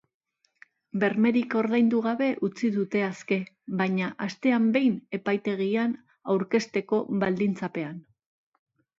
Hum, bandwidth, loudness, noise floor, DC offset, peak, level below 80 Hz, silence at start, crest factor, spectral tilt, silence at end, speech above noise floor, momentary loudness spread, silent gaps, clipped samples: none; 7.6 kHz; -26 LUFS; -59 dBFS; under 0.1%; -10 dBFS; -72 dBFS; 0.95 s; 16 dB; -7 dB/octave; 1 s; 33 dB; 9 LU; none; under 0.1%